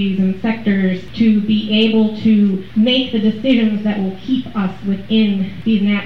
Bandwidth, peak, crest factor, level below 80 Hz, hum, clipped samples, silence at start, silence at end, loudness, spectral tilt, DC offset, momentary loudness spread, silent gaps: 5.8 kHz; -4 dBFS; 12 dB; -46 dBFS; none; under 0.1%; 0 s; 0 s; -16 LUFS; -8 dB/octave; 2%; 6 LU; none